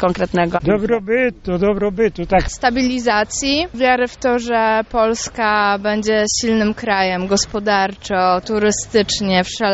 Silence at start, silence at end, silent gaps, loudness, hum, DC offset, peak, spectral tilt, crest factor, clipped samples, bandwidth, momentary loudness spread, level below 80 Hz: 0 s; 0 s; none; -17 LUFS; none; under 0.1%; -2 dBFS; -4 dB/octave; 16 dB; under 0.1%; 8.2 kHz; 2 LU; -38 dBFS